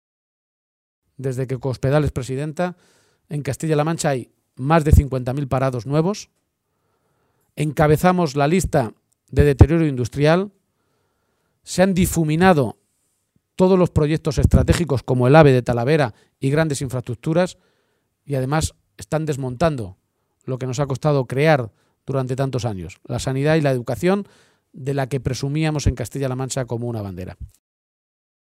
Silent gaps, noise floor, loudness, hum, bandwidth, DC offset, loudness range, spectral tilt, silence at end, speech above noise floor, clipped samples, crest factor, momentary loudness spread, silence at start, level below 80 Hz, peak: none; -71 dBFS; -20 LUFS; none; 16 kHz; under 0.1%; 7 LU; -6.5 dB/octave; 1.15 s; 52 dB; under 0.1%; 20 dB; 13 LU; 1.2 s; -34 dBFS; 0 dBFS